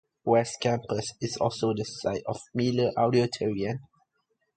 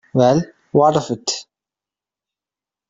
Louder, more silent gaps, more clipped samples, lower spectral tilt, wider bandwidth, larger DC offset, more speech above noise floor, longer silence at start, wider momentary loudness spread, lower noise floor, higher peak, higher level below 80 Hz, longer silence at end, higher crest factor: second, -28 LUFS vs -18 LUFS; neither; neither; about the same, -5.5 dB/octave vs -5.5 dB/octave; first, 9.2 kHz vs 7.8 kHz; neither; second, 49 dB vs 74 dB; about the same, 0.25 s vs 0.15 s; about the same, 9 LU vs 9 LU; second, -76 dBFS vs -89 dBFS; second, -8 dBFS vs -2 dBFS; about the same, -60 dBFS vs -56 dBFS; second, 0.75 s vs 1.45 s; about the same, 20 dB vs 18 dB